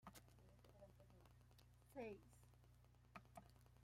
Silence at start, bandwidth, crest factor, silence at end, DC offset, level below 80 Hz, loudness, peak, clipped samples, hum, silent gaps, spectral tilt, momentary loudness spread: 0 s; 16 kHz; 22 dB; 0 s; under 0.1%; -76 dBFS; -62 LUFS; -42 dBFS; under 0.1%; 60 Hz at -70 dBFS; none; -5.5 dB/octave; 12 LU